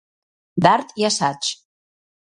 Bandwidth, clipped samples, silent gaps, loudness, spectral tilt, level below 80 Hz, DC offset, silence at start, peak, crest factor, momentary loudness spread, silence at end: 11.5 kHz; under 0.1%; none; -20 LUFS; -3.5 dB/octave; -62 dBFS; under 0.1%; 0.55 s; 0 dBFS; 22 dB; 12 LU; 0.8 s